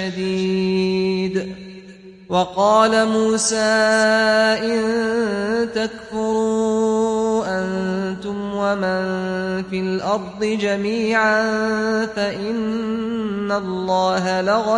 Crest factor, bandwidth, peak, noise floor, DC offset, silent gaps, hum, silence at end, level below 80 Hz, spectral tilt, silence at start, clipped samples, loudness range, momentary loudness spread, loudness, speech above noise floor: 16 dB; 11 kHz; -2 dBFS; -41 dBFS; under 0.1%; none; none; 0 s; -54 dBFS; -4.5 dB/octave; 0 s; under 0.1%; 5 LU; 9 LU; -19 LUFS; 22 dB